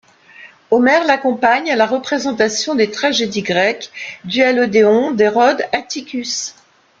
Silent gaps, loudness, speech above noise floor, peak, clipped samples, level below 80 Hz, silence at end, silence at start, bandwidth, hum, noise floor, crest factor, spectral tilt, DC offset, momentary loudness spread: none; -15 LUFS; 27 dB; -2 dBFS; under 0.1%; -60 dBFS; 0.5 s; 0.4 s; 7.8 kHz; none; -42 dBFS; 14 dB; -3.5 dB/octave; under 0.1%; 10 LU